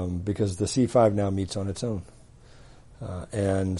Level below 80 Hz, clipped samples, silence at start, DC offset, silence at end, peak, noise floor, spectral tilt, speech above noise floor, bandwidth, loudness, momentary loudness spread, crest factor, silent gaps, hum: -50 dBFS; under 0.1%; 0 s; under 0.1%; 0 s; -8 dBFS; -50 dBFS; -6.5 dB/octave; 25 dB; 11.5 kHz; -26 LUFS; 15 LU; 20 dB; none; none